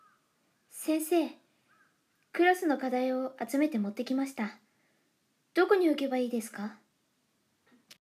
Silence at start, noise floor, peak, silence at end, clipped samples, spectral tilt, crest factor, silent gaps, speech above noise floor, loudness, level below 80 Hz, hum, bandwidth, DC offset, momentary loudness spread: 0.75 s; -75 dBFS; -12 dBFS; 1.25 s; under 0.1%; -4.5 dB/octave; 20 dB; none; 45 dB; -30 LUFS; under -90 dBFS; none; 15.5 kHz; under 0.1%; 13 LU